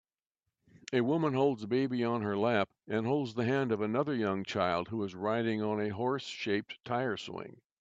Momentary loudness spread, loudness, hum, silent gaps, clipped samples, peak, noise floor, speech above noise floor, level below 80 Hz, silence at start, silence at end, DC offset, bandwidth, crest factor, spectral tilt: 6 LU; -32 LUFS; none; none; under 0.1%; -14 dBFS; -89 dBFS; 57 dB; -74 dBFS; 0.9 s; 0.3 s; under 0.1%; 7.8 kHz; 18 dB; -6.5 dB/octave